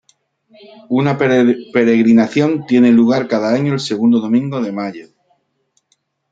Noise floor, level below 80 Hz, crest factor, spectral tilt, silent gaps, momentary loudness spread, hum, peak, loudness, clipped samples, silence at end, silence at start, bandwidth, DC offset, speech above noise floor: -65 dBFS; -60 dBFS; 14 dB; -7 dB/octave; none; 10 LU; none; -2 dBFS; -14 LUFS; under 0.1%; 1.3 s; 0.9 s; 7.8 kHz; under 0.1%; 51 dB